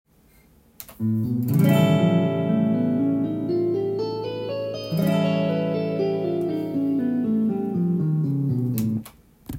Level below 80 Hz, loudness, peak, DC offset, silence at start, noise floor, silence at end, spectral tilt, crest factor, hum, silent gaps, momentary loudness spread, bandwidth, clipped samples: -58 dBFS; -23 LUFS; -6 dBFS; under 0.1%; 0.8 s; -56 dBFS; 0 s; -8 dB/octave; 16 dB; none; none; 9 LU; 16.5 kHz; under 0.1%